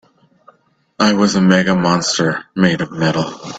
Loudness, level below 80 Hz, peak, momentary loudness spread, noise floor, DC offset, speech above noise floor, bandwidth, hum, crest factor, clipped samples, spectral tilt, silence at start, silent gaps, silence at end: -15 LUFS; -50 dBFS; 0 dBFS; 5 LU; -56 dBFS; under 0.1%; 41 dB; 8 kHz; none; 16 dB; under 0.1%; -5 dB/octave; 1 s; none; 0 s